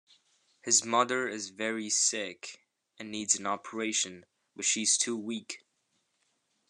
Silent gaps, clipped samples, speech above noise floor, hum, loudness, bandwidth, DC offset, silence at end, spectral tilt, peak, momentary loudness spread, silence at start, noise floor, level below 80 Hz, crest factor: none; under 0.1%; 46 dB; none; -29 LUFS; 12.5 kHz; under 0.1%; 1.15 s; -0.5 dB/octave; -10 dBFS; 18 LU; 0.65 s; -77 dBFS; -84 dBFS; 22 dB